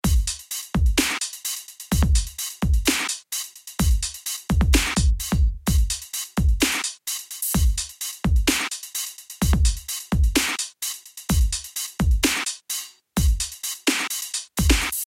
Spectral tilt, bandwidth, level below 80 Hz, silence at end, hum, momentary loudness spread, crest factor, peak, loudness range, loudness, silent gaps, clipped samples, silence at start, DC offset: -3.5 dB/octave; 17 kHz; -24 dBFS; 0 s; none; 9 LU; 18 dB; -4 dBFS; 2 LU; -23 LUFS; none; under 0.1%; 0.05 s; under 0.1%